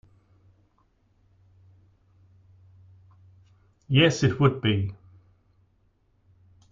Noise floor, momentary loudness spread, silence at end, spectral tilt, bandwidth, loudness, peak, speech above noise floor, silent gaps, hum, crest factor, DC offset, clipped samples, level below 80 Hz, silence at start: -66 dBFS; 8 LU; 1.75 s; -6 dB/octave; 7.6 kHz; -23 LUFS; -6 dBFS; 44 dB; none; none; 24 dB; under 0.1%; under 0.1%; -58 dBFS; 3.9 s